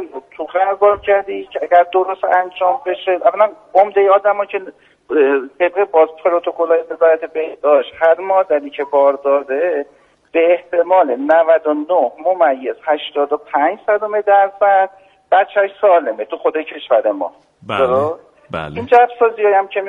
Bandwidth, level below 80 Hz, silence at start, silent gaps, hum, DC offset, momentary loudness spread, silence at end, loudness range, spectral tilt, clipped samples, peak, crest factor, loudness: 4 kHz; -58 dBFS; 0 s; none; none; under 0.1%; 10 LU; 0 s; 1 LU; -6.5 dB/octave; under 0.1%; 0 dBFS; 14 dB; -15 LUFS